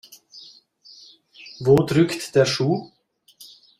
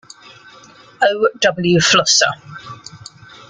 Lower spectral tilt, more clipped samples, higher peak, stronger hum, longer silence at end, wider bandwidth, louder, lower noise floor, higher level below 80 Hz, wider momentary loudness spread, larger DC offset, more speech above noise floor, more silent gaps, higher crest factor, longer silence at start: first, -6 dB/octave vs -2.5 dB/octave; neither; second, -4 dBFS vs 0 dBFS; neither; first, 0.95 s vs 0.55 s; first, 15.5 kHz vs 10 kHz; second, -20 LUFS vs -14 LUFS; first, -51 dBFS vs -44 dBFS; about the same, -56 dBFS vs -56 dBFS; about the same, 25 LU vs 23 LU; neither; about the same, 32 dB vs 29 dB; neither; about the same, 20 dB vs 18 dB; second, 0.35 s vs 1 s